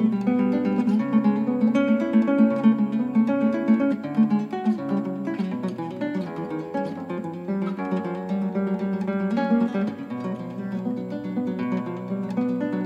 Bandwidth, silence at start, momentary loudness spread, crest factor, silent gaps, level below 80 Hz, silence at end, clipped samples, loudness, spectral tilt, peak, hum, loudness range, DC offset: 6.6 kHz; 0 s; 10 LU; 16 dB; none; -68 dBFS; 0 s; under 0.1%; -24 LUFS; -9 dB/octave; -8 dBFS; none; 7 LU; under 0.1%